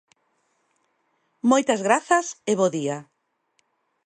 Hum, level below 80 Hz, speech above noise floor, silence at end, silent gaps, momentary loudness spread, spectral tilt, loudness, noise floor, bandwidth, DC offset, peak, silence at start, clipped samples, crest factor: none; -76 dBFS; 49 dB; 1 s; none; 9 LU; -4 dB/octave; -22 LUFS; -70 dBFS; 10 kHz; under 0.1%; -4 dBFS; 1.45 s; under 0.1%; 20 dB